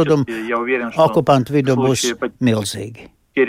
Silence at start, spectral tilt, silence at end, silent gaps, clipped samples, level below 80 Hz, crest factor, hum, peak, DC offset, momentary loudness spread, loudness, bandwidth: 0 s; -5.5 dB/octave; 0 s; none; under 0.1%; -52 dBFS; 16 dB; none; -2 dBFS; under 0.1%; 10 LU; -17 LUFS; 16 kHz